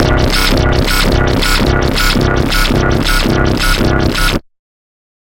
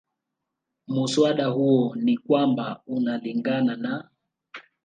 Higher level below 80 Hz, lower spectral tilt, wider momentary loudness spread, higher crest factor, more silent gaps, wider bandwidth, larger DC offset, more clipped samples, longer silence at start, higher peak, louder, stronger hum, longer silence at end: first, -16 dBFS vs -74 dBFS; second, -4.5 dB/octave vs -6 dB/octave; second, 1 LU vs 11 LU; second, 12 dB vs 18 dB; neither; first, 17 kHz vs 9.4 kHz; neither; neither; second, 0 s vs 0.9 s; first, 0 dBFS vs -8 dBFS; first, -12 LUFS vs -24 LUFS; neither; first, 0.8 s vs 0.25 s